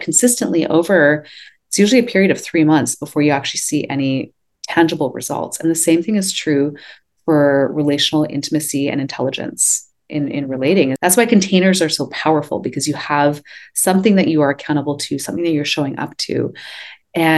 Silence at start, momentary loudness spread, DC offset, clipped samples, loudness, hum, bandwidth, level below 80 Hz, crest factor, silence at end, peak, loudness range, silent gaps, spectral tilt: 0 s; 10 LU; under 0.1%; under 0.1%; -16 LUFS; none; 13 kHz; -62 dBFS; 16 dB; 0 s; 0 dBFS; 3 LU; none; -4 dB/octave